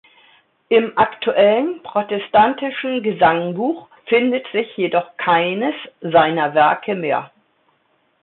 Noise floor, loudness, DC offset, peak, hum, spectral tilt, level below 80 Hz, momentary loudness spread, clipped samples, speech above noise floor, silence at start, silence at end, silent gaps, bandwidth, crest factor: -63 dBFS; -18 LUFS; under 0.1%; -2 dBFS; none; -10 dB/octave; -60 dBFS; 8 LU; under 0.1%; 45 dB; 0.7 s; 1 s; none; 4.2 kHz; 16 dB